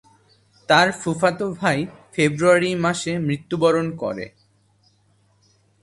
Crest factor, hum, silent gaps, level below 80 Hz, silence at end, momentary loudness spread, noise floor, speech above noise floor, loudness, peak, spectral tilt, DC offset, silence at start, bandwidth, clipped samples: 20 dB; none; none; -58 dBFS; 1.55 s; 12 LU; -61 dBFS; 41 dB; -20 LUFS; -2 dBFS; -5 dB/octave; under 0.1%; 0.7 s; 11.5 kHz; under 0.1%